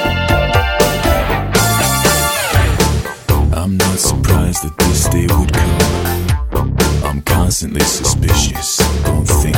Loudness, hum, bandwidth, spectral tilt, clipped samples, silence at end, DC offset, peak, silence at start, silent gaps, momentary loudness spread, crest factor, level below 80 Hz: -14 LUFS; none; 17 kHz; -4 dB/octave; under 0.1%; 0 s; under 0.1%; 0 dBFS; 0 s; none; 4 LU; 14 dB; -20 dBFS